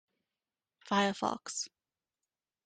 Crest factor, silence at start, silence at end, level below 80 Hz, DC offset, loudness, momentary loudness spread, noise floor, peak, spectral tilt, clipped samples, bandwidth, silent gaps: 22 dB; 0.85 s; 1 s; -76 dBFS; under 0.1%; -34 LUFS; 9 LU; under -90 dBFS; -16 dBFS; -3.5 dB/octave; under 0.1%; 9.6 kHz; none